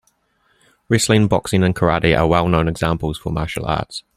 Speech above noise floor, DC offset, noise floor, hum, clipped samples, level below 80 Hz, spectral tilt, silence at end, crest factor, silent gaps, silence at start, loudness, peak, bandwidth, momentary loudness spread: 45 dB; under 0.1%; -62 dBFS; none; under 0.1%; -36 dBFS; -5.5 dB/octave; 0.15 s; 18 dB; none; 0.9 s; -18 LUFS; 0 dBFS; 15.5 kHz; 8 LU